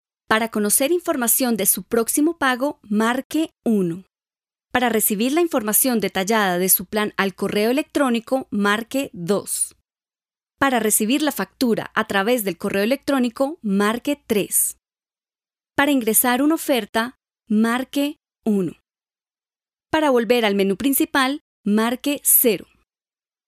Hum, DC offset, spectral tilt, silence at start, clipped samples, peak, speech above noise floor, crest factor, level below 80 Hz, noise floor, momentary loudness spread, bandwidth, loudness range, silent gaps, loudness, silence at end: none; under 0.1%; -3.5 dB/octave; 0.3 s; under 0.1%; -2 dBFS; over 70 dB; 20 dB; -60 dBFS; under -90 dBFS; 7 LU; 16 kHz; 3 LU; 3.25-3.30 s, 16.89-16.93 s, 21.41-21.64 s; -20 LUFS; 0.9 s